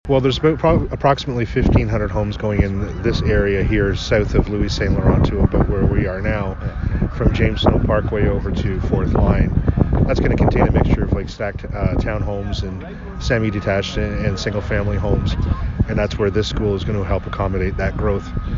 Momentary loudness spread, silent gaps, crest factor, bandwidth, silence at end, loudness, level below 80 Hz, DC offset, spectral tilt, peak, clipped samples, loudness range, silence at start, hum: 6 LU; none; 16 dB; 7.6 kHz; 0 s; -19 LUFS; -24 dBFS; under 0.1%; -7.5 dB/octave; -2 dBFS; under 0.1%; 4 LU; 0.05 s; none